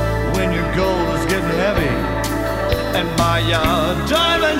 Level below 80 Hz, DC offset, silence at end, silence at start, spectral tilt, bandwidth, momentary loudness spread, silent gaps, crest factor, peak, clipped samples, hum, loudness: -28 dBFS; under 0.1%; 0 s; 0 s; -5 dB/octave; 16.5 kHz; 4 LU; none; 14 dB; -4 dBFS; under 0.1%; none; -18 LUFS